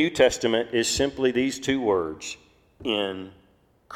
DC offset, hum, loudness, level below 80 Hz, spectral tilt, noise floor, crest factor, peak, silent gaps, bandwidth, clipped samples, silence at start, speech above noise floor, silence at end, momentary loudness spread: under 0.1%; none; -24 LUFS; -52 dBFS; -3.5 dB/octave; -61 dBFS; 20 dB; -6 dBFS; none; 16 kHz; under 0.1%; 0 s; 37 dB; 0 s; 16 LU